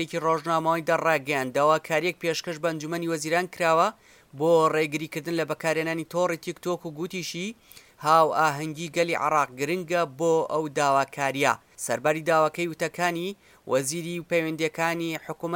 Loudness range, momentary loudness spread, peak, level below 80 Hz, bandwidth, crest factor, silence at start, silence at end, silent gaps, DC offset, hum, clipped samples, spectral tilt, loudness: 2 LU; 9 LU; -6 dBFS; -70 dBFS; 17 kHz; 20 dB; 0 s; 0 s; none; under 0.1%; none; under 0.1%; -4.5 dB/octave; -25 LUFS